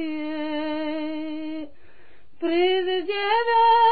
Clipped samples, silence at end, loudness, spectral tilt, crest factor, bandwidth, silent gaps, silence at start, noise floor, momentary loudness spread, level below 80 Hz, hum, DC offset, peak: under 0.1%; 0 s; -23 LUFS; -7.5 dB/octave; 14 dB; 4.9 kHz; none; 0 s; -56 dBFS; 14 LU; -62 dBFS; none; 1%; -10 dBFS